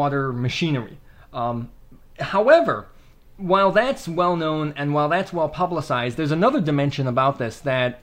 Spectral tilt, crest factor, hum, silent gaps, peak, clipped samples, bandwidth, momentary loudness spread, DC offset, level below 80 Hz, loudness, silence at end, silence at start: -6.5 dB/octave; 20 dB; none; none; -2 dBFS; under 0.1%; 15.5 kHz; 12 LU; under 0.1%; -50 dBFS; -21 LUFS; 0.05 s; 0 s